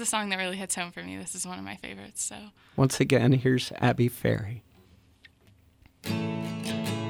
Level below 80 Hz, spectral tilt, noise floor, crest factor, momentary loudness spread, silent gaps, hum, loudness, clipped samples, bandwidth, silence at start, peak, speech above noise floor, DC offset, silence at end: -58 dBFS; -5 dB/octave; -60 dBFS; 20 dB; 16 LU; none; none; -28 LUFS; under 0.1%; 18 kHz; 0 s; -10 dBFS; 32 dB; under 0.1%; 0 s